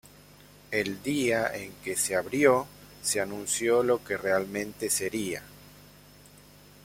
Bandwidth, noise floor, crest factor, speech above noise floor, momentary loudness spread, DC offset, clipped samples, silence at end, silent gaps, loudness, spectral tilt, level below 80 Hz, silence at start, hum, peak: 16.5 kHz; -53 dBFS; 22 dB; 26 dB; 10 LU; under 0.1%; under 0.1%; 1 s; none; -28 LUFS; -3 dB/octave; -62 dBFS; 0.7 s; 50 Hz at -50 dBFS; -8 dBFS